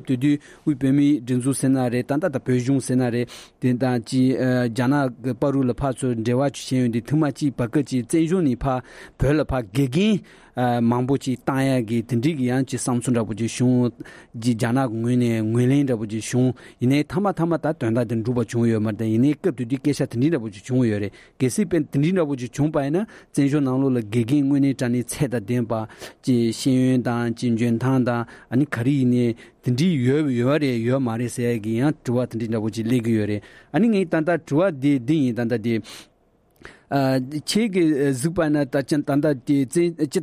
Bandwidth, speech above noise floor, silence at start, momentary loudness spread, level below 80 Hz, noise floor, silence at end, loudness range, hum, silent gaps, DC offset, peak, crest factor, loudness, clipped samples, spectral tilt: 15 kHz; 39 dB; 0 s; 6 LU; -48 dBFS; -61 dBFS; 0 s; 1 LU; none; none; under 0.1%; -8 dBFS; 12 dB; -22 LUFS; under 0.1%; -6.5 dB/octave